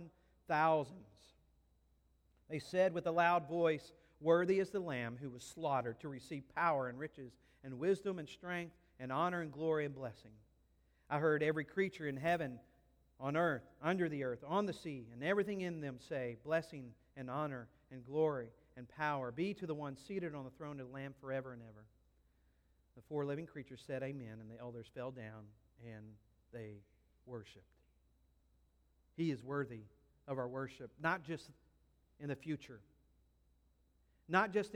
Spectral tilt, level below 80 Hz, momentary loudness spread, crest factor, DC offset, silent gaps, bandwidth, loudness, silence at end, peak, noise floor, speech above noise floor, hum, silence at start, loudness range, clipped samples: -6.5 dB/octave; -74 dBFS; 19 LU; 24 dB; under 0.1%; none; 15.5 kHz; -40 LUFS; 0 s; -18 dBFS; -74 dBFS; 35 dB; none; 0 s; 12 LU; under 0.1%